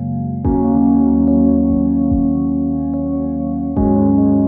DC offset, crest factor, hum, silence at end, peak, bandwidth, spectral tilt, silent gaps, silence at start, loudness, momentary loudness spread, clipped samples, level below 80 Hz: under 0.1%; 10 dB; none; 0 s; -4 dBFS; 1.8 kHz; -15.5 dB/octave; none; 0 s; -15 LUFS; 7 LU; under 0.1%; -28 dBFS